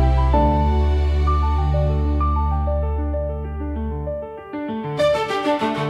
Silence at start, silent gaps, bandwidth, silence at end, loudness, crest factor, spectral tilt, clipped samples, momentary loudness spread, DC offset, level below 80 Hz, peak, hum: 0 s; none; 7.6 kHz; 0 s; -21 LUFS; 14 dB; -8 dB/octave; under 0.1%; 10 LU; under 0.1%; -22 dBFS; -4 dBFS; none